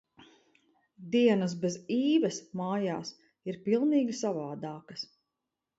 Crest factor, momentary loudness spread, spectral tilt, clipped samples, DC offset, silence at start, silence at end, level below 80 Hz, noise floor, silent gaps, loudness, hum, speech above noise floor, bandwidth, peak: 18 dB; 15 LU; -5.5 dB/octave; under 0.1%; under 0.1%; 1 s; 0.75 s; -78 dBFS; -87 dBFS; none; -30 LUFS; none; 58 dB; 8 kHz; -12 dBFS